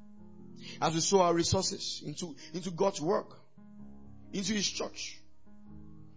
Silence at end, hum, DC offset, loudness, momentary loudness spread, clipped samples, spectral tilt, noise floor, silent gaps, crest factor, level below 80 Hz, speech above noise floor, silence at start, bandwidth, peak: 0.1 s; none; 0.3%; -32 LUFS; 26 LU; under 0.1%; -4 dB/octave; -58 dBFS; none; 22 dB; -58 dBFS; 27 dB; 0 s; 8 kHz; -12 dBFS